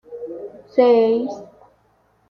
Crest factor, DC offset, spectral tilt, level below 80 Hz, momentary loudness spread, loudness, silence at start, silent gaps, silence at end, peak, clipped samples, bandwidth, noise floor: 18 dB; under 0.1%; -6.5 dB/octave; -66 dBFS; 20 LU; -17 LUFS; 0.1 s; none; 0.85 s; -2 dBFS; under 0.1%; 6.4 kHz; -60 dBFS